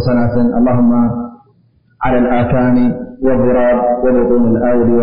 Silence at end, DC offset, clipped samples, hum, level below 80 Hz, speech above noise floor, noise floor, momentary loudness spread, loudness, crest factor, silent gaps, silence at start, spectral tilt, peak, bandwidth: 0 s; 7%; under 0.1%; none; -32 dBFS; 41 dB; -52 dBFS; 6 LU; -13 LUFS; 10 dB; none; 0 s; -8.5 dB/octave; -2 dBFS; 5.2 kHz